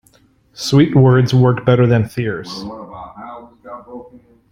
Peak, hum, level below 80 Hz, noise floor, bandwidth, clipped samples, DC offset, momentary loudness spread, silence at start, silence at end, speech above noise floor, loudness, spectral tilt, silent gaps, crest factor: -2 dBFS; none; -48 dBFS; -53 dBFS; 11.5 kHz; under 0.1%; under 0.1%; 24 LU; 0.6 s; 0.5 s; 40 dB; -14 LUFS; -7 dB/octave; none; 14 dB